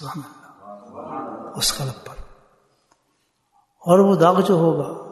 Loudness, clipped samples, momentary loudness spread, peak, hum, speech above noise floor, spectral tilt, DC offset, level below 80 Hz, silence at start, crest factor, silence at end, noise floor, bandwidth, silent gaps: -18 LUFS; under 0.1%; 23 LU; -2 dBFS; none; 50 dB; -5.5 dB/octave; under 0.1%; -50 dBFS; 0 s; 20 dB; 0 s; -68 dBFS; 12.5 kHz; none